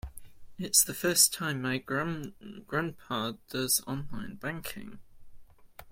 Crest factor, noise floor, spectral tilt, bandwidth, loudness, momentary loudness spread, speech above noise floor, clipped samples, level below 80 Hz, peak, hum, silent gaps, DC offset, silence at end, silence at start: 26 dB; -51 dBFS; -2.5 dB/octave; 16.5 kHz; -29 LUFS; 19 LU; 20 dB; under 0.1%; -56 dBFS; -8 dBFS; none; none; under 0.1%; 0 s; 0.05 s